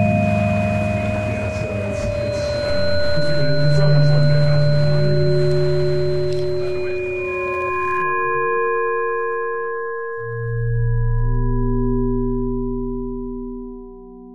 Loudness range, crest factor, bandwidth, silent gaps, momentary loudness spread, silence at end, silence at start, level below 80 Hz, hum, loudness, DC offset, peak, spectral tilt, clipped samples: 5 LU; 14 dB; 10 kHz; none; 10 LU; 0 s; 0 s; -30 dBFS; none; -20 LUFS; under 0.1%; -4 dBFS; -7.5 dB/octave; under 0.1%